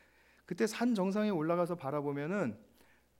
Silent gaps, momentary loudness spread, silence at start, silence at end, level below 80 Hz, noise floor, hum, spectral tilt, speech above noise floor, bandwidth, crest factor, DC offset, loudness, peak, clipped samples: none; 7 LU; 0.5 s; 0.6 s; -76 dBFS; -66 dBFS; none; -6.5 dB/octave; 33 dB; 16 kHz; 16 dB; under 0.1%; -34 LUFS; -18 dBFS; under 0.1%